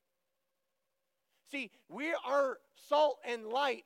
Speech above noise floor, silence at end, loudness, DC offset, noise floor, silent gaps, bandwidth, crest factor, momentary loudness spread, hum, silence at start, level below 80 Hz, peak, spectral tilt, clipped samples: 52 dB; 0.05 s; -34 LUFS; under 0.1%; -86 dBFS; none; 15.5 kHz; 18 dB; 13 LU; none; 1.5 s; under -90 dBFS; -18 dBFS; -2.5 dB/octave; under 0.1%